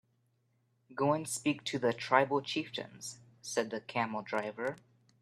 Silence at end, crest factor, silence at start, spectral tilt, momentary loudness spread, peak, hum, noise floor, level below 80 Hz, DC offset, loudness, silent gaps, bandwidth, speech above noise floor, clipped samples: 0.45 s; 26 dB; 0.9 s; -4 dB/octave; 16 LU; -10 dBFS; none; -75 dBFS; -78 dBFS; under 0.1%; -34 LUFS; none; 14 kHz; 41 dB; under 0.1%